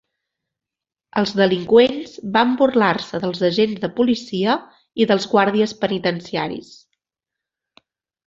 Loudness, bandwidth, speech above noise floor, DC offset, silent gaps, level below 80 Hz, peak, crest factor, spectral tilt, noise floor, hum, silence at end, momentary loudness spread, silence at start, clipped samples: -19 LUFS; 7.8 kHz; 69 dB; under 0.1%; none; -60 dBFS; -2 dBFS; 18 dB; -6 dB/octave; -87 dBFS; none; 1.6 s; 11 LU; 1.15 s; under 0.1%